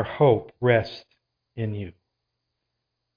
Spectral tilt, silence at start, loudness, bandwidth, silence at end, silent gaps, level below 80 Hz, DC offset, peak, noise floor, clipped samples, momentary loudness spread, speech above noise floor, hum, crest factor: -9 dB/octave; 0 s; -23 LUFS; 5.2 kHz; 1.25 s; none; -58 dBFS; under 0.1%; -6 dBFS; -81 dBFS; under 0.1%; 21 LU; 57 dB; none; 20 dB